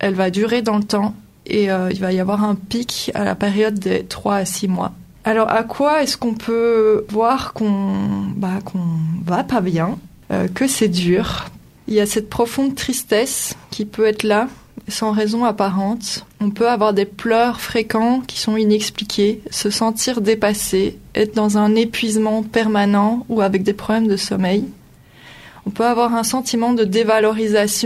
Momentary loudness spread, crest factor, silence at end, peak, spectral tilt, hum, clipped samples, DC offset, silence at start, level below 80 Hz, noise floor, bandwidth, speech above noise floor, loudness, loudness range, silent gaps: 7 LU; 18 dB; 0 s; 0 dBFS; -4.5 dB/octave; none; under 0.1%; under 0.1%; 0 s; -48 dBFS; -45 dBFS; 15 kHz; 28 dB; -18 LUFS; 2 LU; none